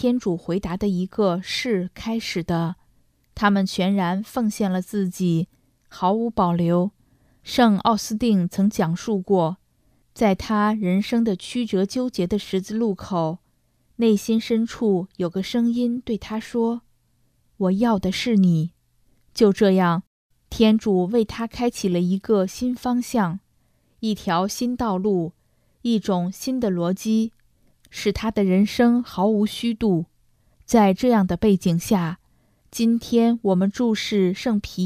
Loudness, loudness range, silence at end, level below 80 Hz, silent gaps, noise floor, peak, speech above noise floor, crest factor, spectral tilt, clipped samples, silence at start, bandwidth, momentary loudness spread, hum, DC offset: -22 LUFS; 4 LU; 0 s; -50 dBFS; 20.07-20.30 s; -64 dBFS; -4 dBFS; 43 dB; 18 dB; -6.5 dB/octave; under 0.1%; 0 s; 15.5 kHz; 9 LU; none; under 0.1%